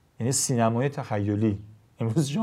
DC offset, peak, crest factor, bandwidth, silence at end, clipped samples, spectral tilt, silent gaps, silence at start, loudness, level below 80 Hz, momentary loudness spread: under 0.1%; -10 dBFS; 16 dB; 16 kHz; 0 s; under 0.1%; -5.5 dB/octave; none; 0.2 s; -26 LUFS; -66 dBFS; 6 LU